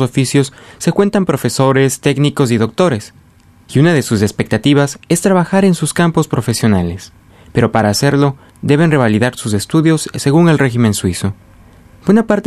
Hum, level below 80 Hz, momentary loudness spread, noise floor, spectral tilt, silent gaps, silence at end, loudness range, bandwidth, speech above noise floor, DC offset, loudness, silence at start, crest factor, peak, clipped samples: none; -44 dBFS; 7 LU; -45 dBFS; -6 dB/octave; none; 0.05 s; 2 LU; 14 kHz; 32 dB; under 0.1%; -13 LUFS; 0 s; 12 dB; 0 dBFS; under 0.1%